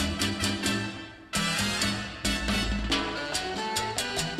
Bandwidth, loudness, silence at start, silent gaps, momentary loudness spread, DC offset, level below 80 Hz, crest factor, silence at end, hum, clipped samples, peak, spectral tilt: 15.5 kHz; -28 LUFS; 0 s; none; 4 LU; under 0.1%; -40 dBFS; 16 dB; 0 s; none; under 0.1%; -14 dBFS; -3 dB/octave